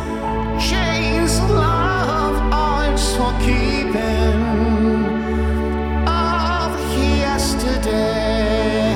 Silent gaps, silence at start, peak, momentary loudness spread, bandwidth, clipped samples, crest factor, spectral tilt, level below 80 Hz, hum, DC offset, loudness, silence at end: none; 0 s; -4 dBFS; 3 LU; 16.5 kHz; under 0.1%; 14 dB; -5.5 dB/octave; -22 dBFS; none; under 0.1%; -18 LUFS; 0 s